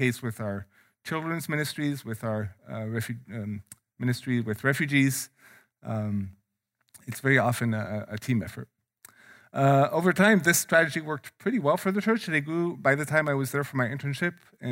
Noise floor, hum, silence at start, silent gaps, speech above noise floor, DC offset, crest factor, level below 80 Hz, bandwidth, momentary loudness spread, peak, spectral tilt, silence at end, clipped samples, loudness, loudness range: -76 dBFS; none; 0 s; none; 49 dB; under 0.1%; 20 dB; -70 dBFS; 16 kHz; 16 LU; -8 dBFS; -5.5 dB/octave; 0 s; under 0.1%; -27 LUFS; 8 LU